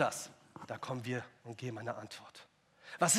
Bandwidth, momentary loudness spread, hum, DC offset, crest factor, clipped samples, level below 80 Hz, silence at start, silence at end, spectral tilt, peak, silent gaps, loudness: 15.5 kHz; 18 LU; none; under 0.1%; 22 dB; under 0.1%; -86 dBFS; 0 s; 0 s; -3 dB/octave; -16 dBFS; none; -42 LUFS